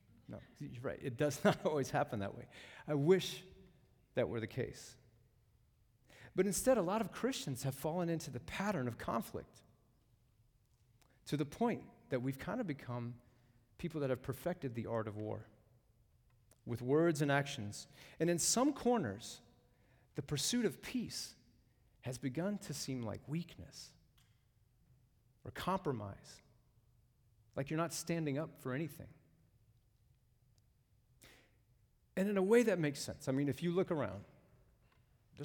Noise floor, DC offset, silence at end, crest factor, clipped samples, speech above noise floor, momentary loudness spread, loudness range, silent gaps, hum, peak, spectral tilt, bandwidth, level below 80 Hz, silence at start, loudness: -73 dBFS; under 0.1%; 0 s; 22 dB; under 0.1%; 35 dB; 18 LU; 9 LU; none; none; -18 dBFS; -5 dB/octave; 19 kHz; -68 dBFS; 0.3 s; -38 LUFS